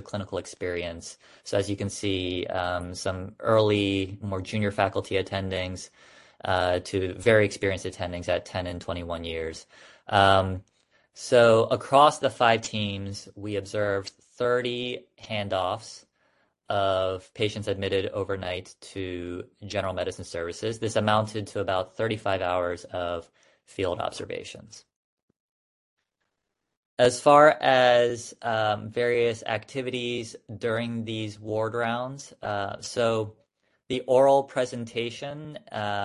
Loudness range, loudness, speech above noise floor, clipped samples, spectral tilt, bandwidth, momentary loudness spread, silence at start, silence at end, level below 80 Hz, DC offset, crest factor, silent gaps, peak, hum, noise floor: 9 LU; -26 LUFS; 56 dB; under 0.1%; -5 dB/octave; 11.5 kHz; 17 LU; 0 s; 0 s; -52 dBFS; under 0.1%; 22 dB; 24.96-25.28 s, 25.40-25.97 s, 26.77-26.97 s; -4 dBFS; none; -82 dBFS